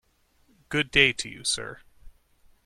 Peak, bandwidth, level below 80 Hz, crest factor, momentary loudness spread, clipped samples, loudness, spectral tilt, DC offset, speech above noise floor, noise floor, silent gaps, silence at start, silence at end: -4 dBFS; 14.5 kHz; -52 dBFS; 26 dB; 11 LU; under 0.1%; -24 LUFS; -2 dB/octave; under 0.1%; 39 dB; -65 dBFS; none; 0.7 s; 0.55 s